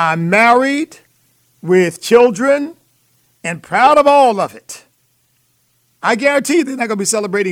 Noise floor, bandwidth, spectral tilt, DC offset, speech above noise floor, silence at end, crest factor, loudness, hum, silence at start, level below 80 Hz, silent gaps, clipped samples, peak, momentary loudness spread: -60 dBFS; 16.5 kHz; -4.5 dB/octave; under 0.1%; 47 dB; 0 s; 14 dB; -13 LUFS; none; 0 s; -62 dBFS; none; under 0.1%; 0 dBFS; 17 LU